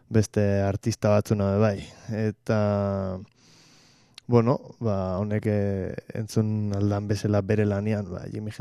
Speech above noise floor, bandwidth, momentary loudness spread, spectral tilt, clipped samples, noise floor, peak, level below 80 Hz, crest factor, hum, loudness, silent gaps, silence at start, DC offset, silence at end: 32 dB; 12.5 kHz; 11 LU; -7.5 dB/octave; under 0.1%; -57 dBFS; -6 dBFS; -56 dBFS; 20 dB; none; -26 LUFS; none; 0.1 s; under 0.1%; 0.05 s